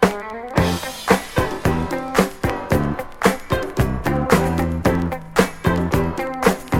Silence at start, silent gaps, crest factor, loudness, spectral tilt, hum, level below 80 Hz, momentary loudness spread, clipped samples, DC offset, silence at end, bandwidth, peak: 0 s; none; 20 dB; -20 LUFS; -6 dB/octave; none; -32 dBFS; 6 LU; under 0.1%; under 0.1%; 0 s; 17 kHz; 0 dBFS